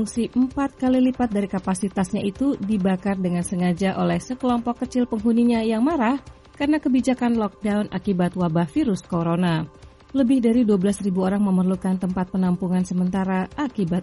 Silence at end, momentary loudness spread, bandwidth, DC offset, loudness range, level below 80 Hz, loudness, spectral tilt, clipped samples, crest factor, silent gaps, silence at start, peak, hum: 0 s; 5 LU; 11.5 kHz; under 0.1%; 2 LU; -48 dBFS; -22 LUFS; -7 dB/octave; under 0.1%; 14 dB; none; 0 s; -8 dBFS; none